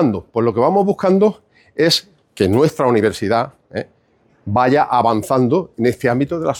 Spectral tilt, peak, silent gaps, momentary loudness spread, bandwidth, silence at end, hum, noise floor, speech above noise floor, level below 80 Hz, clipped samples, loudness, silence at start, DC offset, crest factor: -6 dB/octave; -4 dBFS; none; 12 LU; 18.5 kHz; 0 s; none; -57 dBFS; 41 dB; -52 dBFS; under 0.1%; -16 LUFS; 0 s; under 0.1%; 14 dB